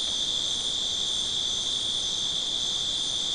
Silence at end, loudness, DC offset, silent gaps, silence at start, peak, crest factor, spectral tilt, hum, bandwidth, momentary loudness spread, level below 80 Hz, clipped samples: 0 s; -25 LUFS; 0.2%; none; 0 s; -16 dBFS; 12 dB; 0 dB/octave; none; 12 kHz; 1 LU; -54 dBFS; under 0.1%